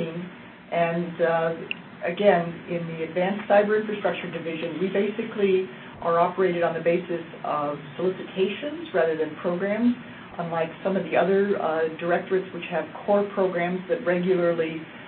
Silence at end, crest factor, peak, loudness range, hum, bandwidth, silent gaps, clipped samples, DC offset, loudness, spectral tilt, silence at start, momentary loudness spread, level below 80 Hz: 0 s; 18 dB; -6 dBFS; 2 LU; none; 4.4 kHz; none; under 0.1%; under 0.1%; -25 LUFS; -11 dB/octave; 0 s; 10 LU; -66 dBFS